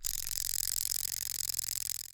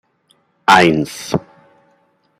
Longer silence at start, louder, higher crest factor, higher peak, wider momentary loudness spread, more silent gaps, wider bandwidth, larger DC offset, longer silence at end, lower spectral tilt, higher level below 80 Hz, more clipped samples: second, 0 s vs 0.7 s; second, -32 LUFS vs -14 LUFS; first, 26 dB vs 18 dB; second, -10 dBFS vs 0 dBFS; second, 3 LU vs 13 LU; neither; first, over 20 kHz vs 16 kHz; neither; second, 0 s vs 1 s; second, 2 dB/octave vs -4.5 dB/octave; about the same, -54 dBFS vs -50 dBFS; neither